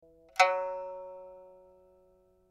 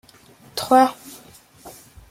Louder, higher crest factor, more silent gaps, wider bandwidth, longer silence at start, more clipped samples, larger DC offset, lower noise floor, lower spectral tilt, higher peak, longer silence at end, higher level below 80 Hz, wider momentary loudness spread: second, -30 LUFS vs -19 LUFS; about the same, 26 dB vs 22 dB; neither; second, 14.5 kHz vs 16.5 kHz; second, 0.35 s vs 0.55 s; neither; neither; first, -65 dBFS vs -50 dBFS; second, 0 dB/octave vs -3.5 dB/octave; second, -8 dBFS vs -2 dBFS; first, 1 s vs 0.4 s; second, -74 dBFS vs -58 dBFS; second, 22 LU vs 26 LU